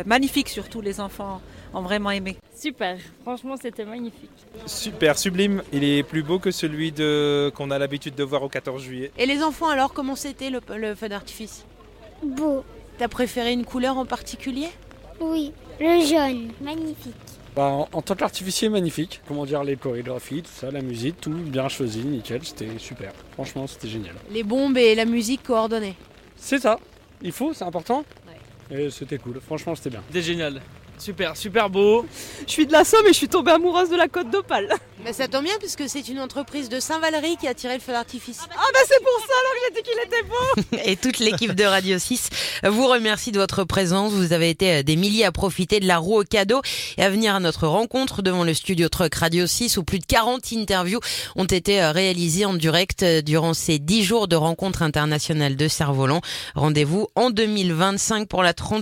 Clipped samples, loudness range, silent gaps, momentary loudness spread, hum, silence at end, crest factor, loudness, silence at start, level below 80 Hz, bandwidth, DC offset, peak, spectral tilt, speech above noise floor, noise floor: under 0.1%; 9 LU; none; 15 LU; none; 0 s; 20 dB; -22 LUFS; 0 s; -46 dBFS; 16.5 kHz; under 0.1%; -2 dBFS; -4 dB/octave; 24 dB; -46 dBFS